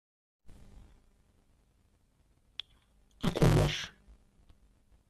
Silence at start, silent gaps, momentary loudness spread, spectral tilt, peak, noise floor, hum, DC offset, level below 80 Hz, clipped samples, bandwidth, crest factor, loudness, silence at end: 0.5 s; none; 19 LU; -6 dB/octave; -12 dBFS; -69 dBFS; none; under 0.1%; -44 dBFS; under 0.1%; 14 kHz; 24 dB; -30 LUFS; 1.2 s